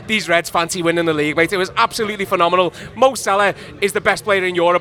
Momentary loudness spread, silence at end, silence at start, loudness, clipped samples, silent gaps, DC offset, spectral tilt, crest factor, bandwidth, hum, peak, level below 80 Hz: 4 LU; 0 s; 0 s; -17 LUFS; under 0.1%; none; under 0.1%; -3.5 dB/octave; 16 dB; 18.5 kHz; none; 0 dBFS; -50 dBFS